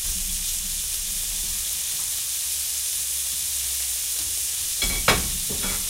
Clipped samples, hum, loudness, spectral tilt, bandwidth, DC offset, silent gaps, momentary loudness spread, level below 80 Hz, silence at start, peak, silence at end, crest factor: under 0.1%; none; -23 LUFS; -0.5 dB/octave; 16 kHz; under 0.1%; none; 4 LU; -38 dBFS; 0 s; -4 dBFS; 0 s; 22 dB